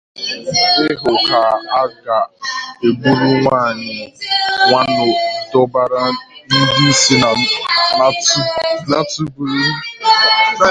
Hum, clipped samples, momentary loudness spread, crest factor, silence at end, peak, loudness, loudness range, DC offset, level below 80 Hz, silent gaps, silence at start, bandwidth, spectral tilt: none; under 0.1%; 10 LU; 14 dB; 0 s; 0 dBFS; -13 LUFS; 3 LU; under 0.1%; -50 dBFS; none; 0.15 s; 10.5 kHz; -3 dB/octave